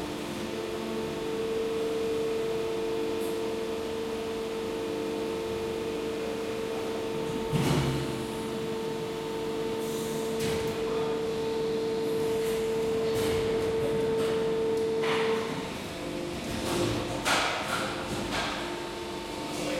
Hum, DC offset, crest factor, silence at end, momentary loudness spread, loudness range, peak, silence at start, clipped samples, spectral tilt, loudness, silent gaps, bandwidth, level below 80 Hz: none; under 0.1%; 18 dB; 0 s; 6 LU; 4 LU; -12 dBFS; 0 s; under 0.1%; -4.5 dB/octave; -31 LUFS; none; 16.5 kHz; -52 dBFS